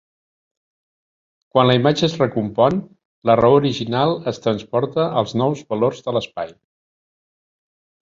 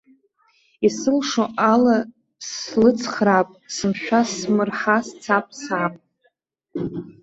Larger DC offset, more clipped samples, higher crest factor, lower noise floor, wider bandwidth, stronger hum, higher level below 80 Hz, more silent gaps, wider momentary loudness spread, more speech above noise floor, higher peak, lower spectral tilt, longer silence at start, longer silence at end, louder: neither; neither; about the same, 18 dB vs 18 dB; first, under -90 dBFS vs -67 dBFS; about the same, 7.6 kHz vs 8 kHz; neither; first, -54 dBFS vs -60 dBFS; first, 3.05-3.22 s vs none; second, 9 LU vs 12 LU; first, over 72 dB vs 47 dB; about the same, -2 dBFS vs -2 dBFS; first, -6.5 dB/octave vs -4.5 dB/octave; first, 1.55 s vs 0.8 s; first, 1.6 s vs 0.1 s; about the same, -19 LUFS vs -21 LUFS